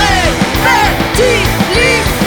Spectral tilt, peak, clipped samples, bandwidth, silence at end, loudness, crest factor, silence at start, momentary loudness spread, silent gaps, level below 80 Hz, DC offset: -4 dB/octave; 0 dBFS; under 0.1%; over 20 kHz; 0 s; -10 LUFS; 10 dB; 0 s; 2 LU; none; -22 dBFS; under 0.1%